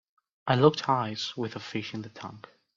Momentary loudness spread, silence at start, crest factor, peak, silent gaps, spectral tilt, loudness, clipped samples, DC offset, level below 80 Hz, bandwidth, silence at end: 19 LU; 0.45 s; 22 dB; -6 dBFS; none; -6 dB/octave; -28 LUFS; under 0.1%; under 0.1%; -68 dBFS; 7.6 kHz; 0.4 s